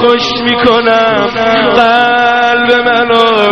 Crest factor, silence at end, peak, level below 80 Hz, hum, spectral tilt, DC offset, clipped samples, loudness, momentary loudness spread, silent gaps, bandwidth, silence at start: 8 dB; 0 s; 0 dBFS; -42 dBFS; none; -4.5 dB/octave; 0.7%; 0.5%; -8 LUFS; 3 LU; none; 7.8 kHz; 0 s